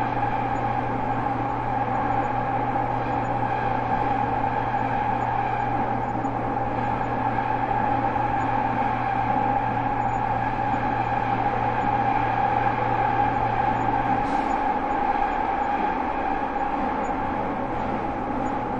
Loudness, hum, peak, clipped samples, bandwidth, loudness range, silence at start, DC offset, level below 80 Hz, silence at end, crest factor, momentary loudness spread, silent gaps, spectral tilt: -24 LUFS; none; -10 dBFS; under 0.1%; 7.4 kHz; 2 LU; 0 s; under 0.1%; -40 dBFS; 0 s; 14 dB; 3 LU; none; -7.5 dB/octave